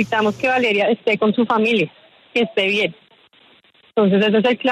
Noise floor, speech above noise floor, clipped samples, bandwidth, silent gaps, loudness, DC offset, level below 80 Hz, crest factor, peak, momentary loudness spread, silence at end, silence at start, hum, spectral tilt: -53 dBFS; 36 dB; under 0.1%; 10 kHz; none; -18 LUFS; under 0.1%; -64 dBFS; 14 dB; -4 dBFS; 7 LU; 0 s; 0 s; none; -6 dB/octave